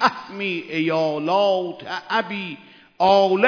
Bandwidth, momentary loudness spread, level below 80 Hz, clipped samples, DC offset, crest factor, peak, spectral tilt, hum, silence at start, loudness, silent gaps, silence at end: 5.4 kHz; 13 LU; -66 dBFS; under 0.1%; under 0.1%; 18 dB; -2 dBFS; -5.5 dB/octave; none; 0 s; -21 LUFS; none; 0 s